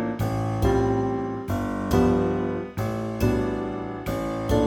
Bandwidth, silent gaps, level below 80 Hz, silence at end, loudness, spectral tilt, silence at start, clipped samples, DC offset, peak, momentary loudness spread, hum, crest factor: 18.5 kHz; none; -36 dBFS; 0 s; -25 LUFS; -7.5 dB/octave; 0 s; under 0.1%; under 0.1%; -8 dBFS; 7 LU; none; 16 dB